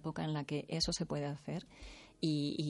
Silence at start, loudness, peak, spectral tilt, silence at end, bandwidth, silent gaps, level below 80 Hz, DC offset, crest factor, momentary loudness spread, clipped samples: 0 s; -38 LUFS; -20 dBFS; -5 dB/octave; 0 s; 11.5 kHz; none; -58 dBFS; under 0.1%; 18 dB; 17 LU; under 0.1%